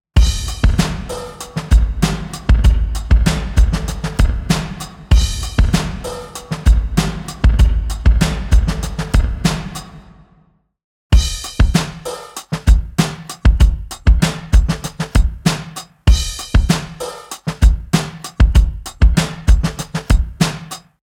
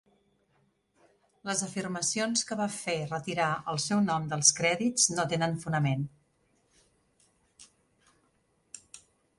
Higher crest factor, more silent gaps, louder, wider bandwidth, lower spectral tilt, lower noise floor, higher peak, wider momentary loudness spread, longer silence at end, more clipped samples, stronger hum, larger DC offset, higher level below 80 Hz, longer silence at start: second, 14 dB vs 26 dB; first, 10.84-11.10 s vs none; first, -17 LUFS vs -28 LUFS; first, 15.5 kHz vs 11.5 kHz; first, -5.5 dB/octave vs -3 dB/octave; second, -55 dBFS vs -71 dBFS; first, 0 dBFS vs -6 dBFS; second, 12 LU vs 15 LU; second, 0.25 s vs 0.4 s; neither; neither; neither; first, -16 dBFS vs -68 dBFS; second, 0.15 s vs 1.45 s